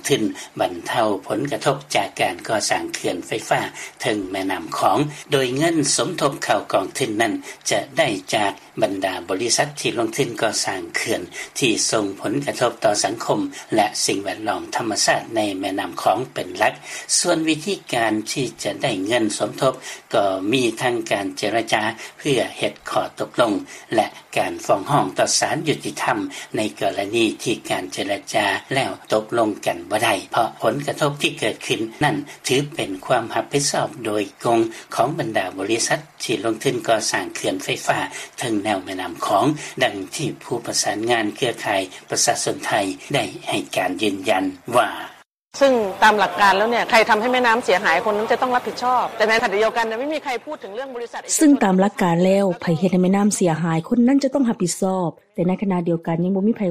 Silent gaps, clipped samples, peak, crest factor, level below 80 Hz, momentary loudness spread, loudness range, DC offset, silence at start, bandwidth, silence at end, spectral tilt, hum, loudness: 45.34-45.46 s; under 0.1%; -2 dBFS; 18 dB; -60 dBFS; 8 LU; 4 LU; under 0.1%; 0.05 s; 15 kHz; 0 s; -3.5 dB/octave; none; -21 LUFS